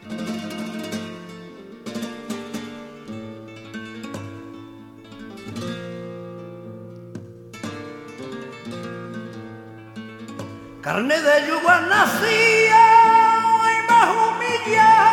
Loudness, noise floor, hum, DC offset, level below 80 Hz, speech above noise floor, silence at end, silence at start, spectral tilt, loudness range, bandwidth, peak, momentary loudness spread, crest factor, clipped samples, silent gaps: -16 LUFS; -41 dBFS; none; under 0.1%; -62 dBFS; 26 dB; 0 s; 0.05 s; -3.5 dB/octave; 20 LU; 17 kHz; -2 dBFS; 25 LU; 18 dB; under 0.1%; none